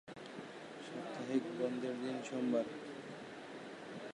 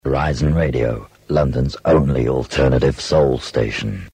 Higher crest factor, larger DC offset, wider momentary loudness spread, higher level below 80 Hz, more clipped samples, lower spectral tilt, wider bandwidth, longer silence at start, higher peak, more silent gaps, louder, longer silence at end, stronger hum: about the same, 18 dB vs 14 dB; neither; first, 13 LU vs 6 LU; second, -84 dBFS vs -28 dBFS; neither; second, -5.5 dB/octave vs -7 dB/octave; first, 11.5 kHz vs 10 kHz; about the same, 0.05 s vs 0.05 s; second, -24 dBFS vs -4 dBFS; neither; second, -42 LUFS vs -18 LUFS; about the same, 0 s vs 0.05 s; neither